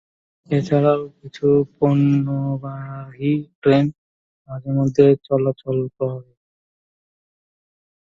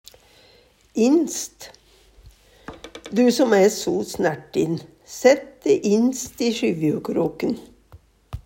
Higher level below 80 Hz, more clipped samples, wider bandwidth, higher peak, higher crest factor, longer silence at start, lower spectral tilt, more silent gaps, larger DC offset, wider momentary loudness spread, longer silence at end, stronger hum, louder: second, -58 dBFS vs -52 dBFS; neither; second, 7.2 kHz vs 16.5 kHz; about the same, 0 dBFS vs -2 dBFS; about the same, 20 dB vs 20 dB; second, 0.5 s vs 0.95 s; first, -9 dB/octave vs -5 dB/octave; first, 3.55-3.62 s, 3.98-4.45 s vs none; neither; second, 16 LU vs 21 LU; first, 1.95 s vs 0.05 s; neither; about the same, -19 LUFS vs -21 LUFS